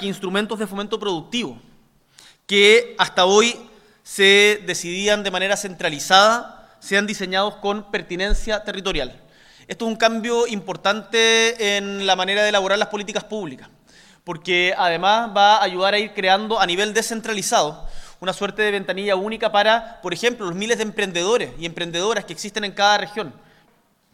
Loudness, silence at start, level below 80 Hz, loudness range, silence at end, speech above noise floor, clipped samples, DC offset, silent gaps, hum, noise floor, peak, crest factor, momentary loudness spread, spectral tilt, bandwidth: -19 LUFS; 0 s; -40 dBFS; 6 LU; 0.8 s; 40 dB; under 0.1%; under 0.1%; none; none; -60 dBFS; 0 dBFS; 20 dB; 13 LU; -2.5 dB/octave; 16 kHz